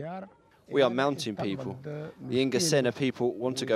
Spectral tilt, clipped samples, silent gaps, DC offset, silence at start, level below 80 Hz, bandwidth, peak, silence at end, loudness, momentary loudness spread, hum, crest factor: -4.5 dB/octave; under 0.1%; none; under 0.1%; 0 s; -70 dBFS; 15.5 kHz; -10 dBFS; 0 s; -28 LUFS; 15 LU; none; 20 dB